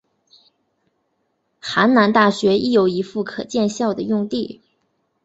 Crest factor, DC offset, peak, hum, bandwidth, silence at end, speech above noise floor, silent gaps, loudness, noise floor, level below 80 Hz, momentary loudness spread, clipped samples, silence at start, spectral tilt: 18 dB; under 0.1%; -2 dBFS; none; 8 kHz; 0.7 s; 52 dB; none; -18 LUFS; -70 dBFS; -60 dBFS; 12 LU; under 0.1%; 1.65 s; -5.5 dB/octave